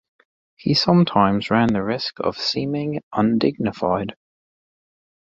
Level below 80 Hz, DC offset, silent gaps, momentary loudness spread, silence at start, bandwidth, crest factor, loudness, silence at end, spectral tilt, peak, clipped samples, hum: -52 dBFS; under 0.1%; 3.03-3.11 s; 9 LU; 0.65 s; 7.8 kHz; 20 dB; -20 LUFS; 1.1 s; -6.5 dB/octave; -2 dBFS; under 0.1%; none